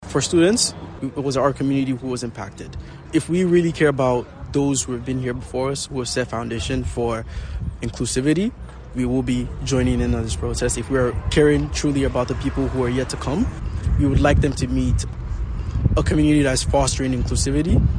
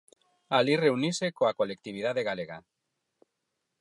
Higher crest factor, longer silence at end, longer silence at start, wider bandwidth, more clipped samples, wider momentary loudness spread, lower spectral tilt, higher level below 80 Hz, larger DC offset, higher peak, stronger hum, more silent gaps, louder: about the same, 16 dB vs 20 dB; second, 0 s vs 1.2 s; second, 0 s vs 0.5 s; second, 10 kHz vs 11.5 kHz; neither; about the same, 12 LU vs 11 LU; about the same, -5.5 dB/octave vs -5 dB/octave; first, -28 dBFS vs -76 dBFS; neither; first, -4 dBFS vs -10 dBFS; neither; neither; first, -21 LUFS vs -28 LUFS